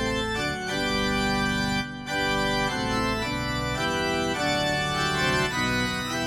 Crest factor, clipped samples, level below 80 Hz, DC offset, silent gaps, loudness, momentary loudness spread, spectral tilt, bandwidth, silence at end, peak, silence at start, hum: 14 dB; under 0.1%; -42 dBFS; under 0.1%; none; -25 LUFS; 4 LU; -4 dB/octave; 16 kHz; 0 s; -12 dBFS; 0 s; none